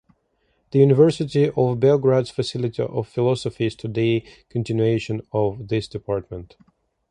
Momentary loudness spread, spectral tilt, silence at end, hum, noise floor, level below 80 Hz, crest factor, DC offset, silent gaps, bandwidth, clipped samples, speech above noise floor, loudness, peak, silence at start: 11 LU; -7.5 dB/octave; 0.65 s; none; -68 dBFS; -52 dBFS; 18 dB; under 0.1%; none; 10 kHz; under 0.1%; 47 dB; -21 LUFS; -2 dBFS; 0.75 s